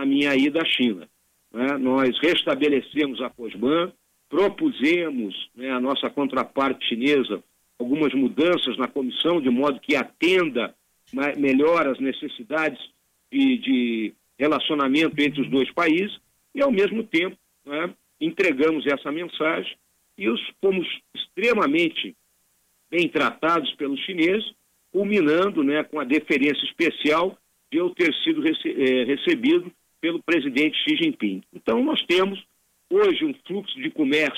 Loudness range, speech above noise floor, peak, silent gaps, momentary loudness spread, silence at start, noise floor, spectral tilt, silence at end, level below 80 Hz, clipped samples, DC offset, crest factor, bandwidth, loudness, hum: 2 LU; 44 dB; -12 dBFS; none; 10 LU; 0 s; -66 dBFS; -5.5 dB/octave; 0 s; -66 dBFS; under 0.1%; under 0.1%; 12 dB; 15 kHz; -23 LUFS; none